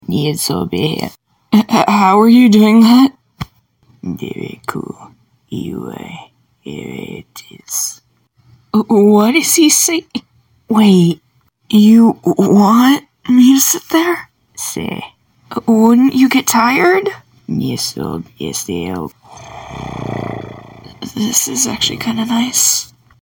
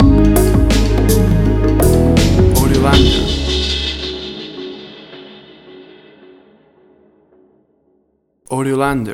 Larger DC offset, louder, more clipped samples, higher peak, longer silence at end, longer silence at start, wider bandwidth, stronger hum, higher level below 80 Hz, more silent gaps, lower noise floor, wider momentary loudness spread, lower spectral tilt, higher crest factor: neither; about the same, -12 LUFS vs -13 LUFS; neither; about the same, 0 dBFS vs 0 dBFS; first, 0.4 s vs 0 s; about the same, 0.1 s vs 0 s; about the same, 17 kHz vs 17 kHz; neither; second, -50 dBFS vs -20 dBFS; neither; second, -52 dBFS vs -61 dBFS; about the same, 20 LU vs 18 LU; second, -4 dB/octave vs -5.5 dB/octave; about the same, 14 dB vs 14 dB